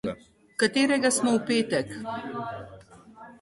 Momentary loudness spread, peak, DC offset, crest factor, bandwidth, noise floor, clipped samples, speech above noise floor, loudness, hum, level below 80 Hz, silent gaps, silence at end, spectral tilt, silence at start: 17 LU; -8 dBFS; under 0.1%; 20 dB; 12 kHz; -49 dBFS; under 0.1%; 23 dB; -26 LUFS; none; -62 dBFS; none; 0.1 s; -3.5 dB/octave; 0.05 s